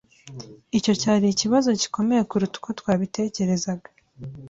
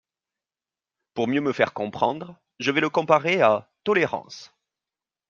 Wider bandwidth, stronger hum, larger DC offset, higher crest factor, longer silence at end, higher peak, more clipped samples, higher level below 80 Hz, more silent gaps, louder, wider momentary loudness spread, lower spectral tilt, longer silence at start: about the same, 8 kHz vs 7.4 kHz; neither; neither; second, 16 dB vs 22 dB; second, 0 s vs 0.85 s; second, -8 dBFS vs -4 dBFS; neither; first, -58 dBFS vs -70 dBFS; neither; about the same, -23 LUFS vs -23 LUFS; first, 21 LU vs 16 LU; about the same, -5 dB/octave vs -5.5 dB/octave; second, 0.25 s vs 1.15 s